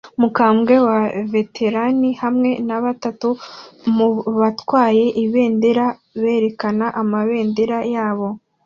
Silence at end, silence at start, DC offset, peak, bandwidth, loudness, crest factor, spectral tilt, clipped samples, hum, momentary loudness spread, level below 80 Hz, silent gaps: 0.3 s; 0.05 s; under 0.1%; -2 dBFS; 7 kHz; -18 LUFS; 16 dB; -7.5 dB/octave; under 0.1%; none; 8 LU; -62 dBFS; none